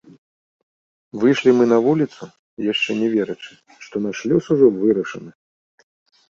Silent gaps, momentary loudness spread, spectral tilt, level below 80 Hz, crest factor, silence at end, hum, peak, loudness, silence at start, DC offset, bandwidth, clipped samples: 2.39-2.57 s; 20 LU; -6 dB/octave; -62 dBFS; 18 dB; 1 s; none; -2 dBFS; -18 LUFS; 1.15 s; under 0.1%; 7.6 kHz; under 0.1%